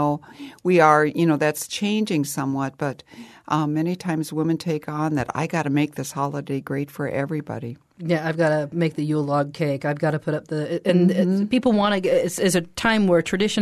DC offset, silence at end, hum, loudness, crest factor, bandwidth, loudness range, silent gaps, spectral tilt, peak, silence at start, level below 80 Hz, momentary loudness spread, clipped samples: under 0.1%; 0 s; none; -22 LUFS; 20 dB; 13.5 kHz; 5 LU; none; -5.5 dB/octave; -2 dBFS; 0 s; -58 dBFS; 10 LU; under 0.1%